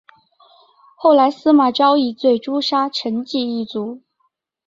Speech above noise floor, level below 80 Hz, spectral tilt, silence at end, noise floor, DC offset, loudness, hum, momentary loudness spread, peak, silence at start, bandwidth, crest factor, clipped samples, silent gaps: 52 dB; -66 dBFS; -5.5 dB/octave; 0.7 s; -68 dBFS; under 0.1%; -17 LUFS; none; 10 LU; -2 dBFS; 1 s; 7.6 kHz; 16 dB; under 0.1%; none